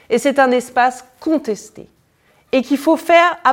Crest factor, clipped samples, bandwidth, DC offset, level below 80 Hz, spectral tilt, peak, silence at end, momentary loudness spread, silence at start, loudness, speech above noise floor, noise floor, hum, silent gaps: 16 dB; under 0.1%; 17 kHz; under 0.1%; -60 dBFS; -3.5 dB/octave; 0 dBFS; 0 s; 11 LU; 0.1 s; -16 LUFS; 41 dB; -56 dBFS; none; none